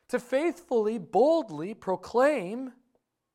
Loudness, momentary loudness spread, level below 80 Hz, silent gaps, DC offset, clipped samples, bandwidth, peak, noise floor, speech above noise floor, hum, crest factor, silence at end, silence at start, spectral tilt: -27 LUFS; 13 LU; -70 dBFS; none; under 0.1%; under 0.1%; 14 kHz; -12 dBFS; -75 dBFS; 48 dB; none; 16 dB; 0.65 s; 0.1 s; -6 dB/octave